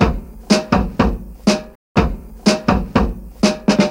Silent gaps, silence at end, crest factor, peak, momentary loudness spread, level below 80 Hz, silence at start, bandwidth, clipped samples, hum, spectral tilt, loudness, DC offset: 1.75-1.95 s; 0 s; 16 dB; 0 dBFS; 6 LU; -26 dBFS; 0 s; 16 kHz; under 0.1%; none; -5.5 dB/octave; -18 LUFS; under 0.1%